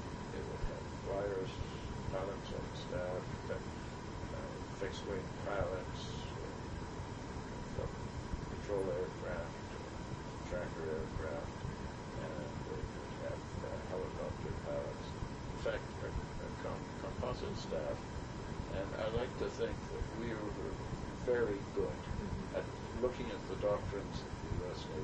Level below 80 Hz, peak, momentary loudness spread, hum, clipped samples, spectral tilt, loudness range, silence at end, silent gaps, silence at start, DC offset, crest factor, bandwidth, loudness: -50 dBFS; -24 dBFS; 6 LU; none; under 0.1%; -6 dB/octave; 3 LU; 0 s; none; 0 s; under 0.1%; 18 dB; 10 kHz; -42 LUFS